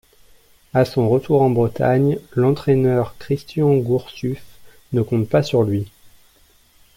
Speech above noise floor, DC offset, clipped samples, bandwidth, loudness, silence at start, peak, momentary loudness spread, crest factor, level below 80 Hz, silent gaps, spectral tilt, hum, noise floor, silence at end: 36 dB; under 0.1%; under 0.1%; 16.5 kHz; -19 LUFS; 0.75 s; -4 dBFS; 9 LU; 16 dB; -50 dBFS; none; -8.5 dB/octave; none; -54 dBFS; 1.1 s